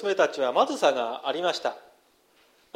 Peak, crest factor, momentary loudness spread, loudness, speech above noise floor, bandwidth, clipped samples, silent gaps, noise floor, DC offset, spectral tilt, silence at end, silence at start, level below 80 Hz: -8 dBFS; 20 dB; 9 LU; -26 LUFS; 37 dB; 15 kHz; under 0.1%; none; -62 dBFS; under 0.1%; -2.5 dB/octave; 0.95 s; 0 s; -80 dBFS